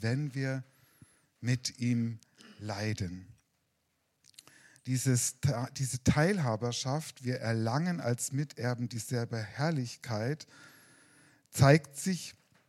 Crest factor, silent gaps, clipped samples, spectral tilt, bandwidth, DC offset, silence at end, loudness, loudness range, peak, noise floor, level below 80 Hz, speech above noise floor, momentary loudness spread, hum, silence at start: 24 dB; none; under 0.1%; -5.5 dB/octave; 15.5 kHz; under 0.1%; 0.35 s; -32 LUFS; 6 LU; -8 dBFS; -78 dBFS; -62 dBFS; 46 dB; 13 LU; none; 0 s